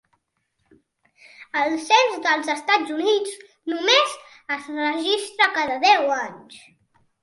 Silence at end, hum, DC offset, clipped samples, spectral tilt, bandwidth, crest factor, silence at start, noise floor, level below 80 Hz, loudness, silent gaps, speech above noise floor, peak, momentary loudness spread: 0.65 s; none; under 0.1%; under 0.1%; -1 dB/octave; 11.5 kHz; 20 dB; 1.4 s; -73 dBFS; -74 dBFS; -20 LUFS; none; 52 dB; -2 dBFS; 12 LU